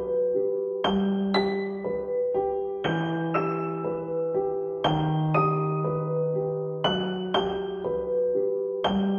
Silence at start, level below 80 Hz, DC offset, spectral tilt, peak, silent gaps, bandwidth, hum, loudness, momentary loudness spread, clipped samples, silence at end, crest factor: 0 s; -54 dBFS; under 0.1%; -8 dB/octave; -8 dBFS; none; 6.8 kHz; none; -27 LUFS; 5 LU; under 0.1%; 0 s; 18 dB